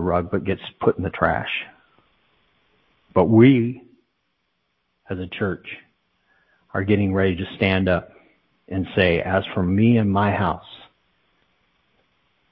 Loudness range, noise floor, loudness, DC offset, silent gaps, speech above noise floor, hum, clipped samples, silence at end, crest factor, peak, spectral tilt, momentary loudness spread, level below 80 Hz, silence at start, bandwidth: 5 LU; -72 dBFS; -21 LUFS; under 0.1%; none; 52 dB; none; under 0.1%; 1.75 s; 20 dB; -2 dBFS; -11 dB/octave; 16 LU; -42 dBFS; 0 s; 5.2 kHz